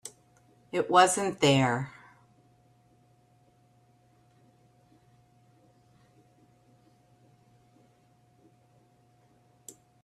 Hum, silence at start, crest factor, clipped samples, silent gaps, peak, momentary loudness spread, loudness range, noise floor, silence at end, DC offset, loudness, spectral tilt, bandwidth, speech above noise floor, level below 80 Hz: none; 0.05 s; 26 dB; under 0.1%; none; -8 dBFS; 29 LU; 11 LU; -64 dBFS; 8.15 s; under 0.1%; -25 LUFS; -4 dB/octave; 13.5 kHz; 40 dB; -72 dBFS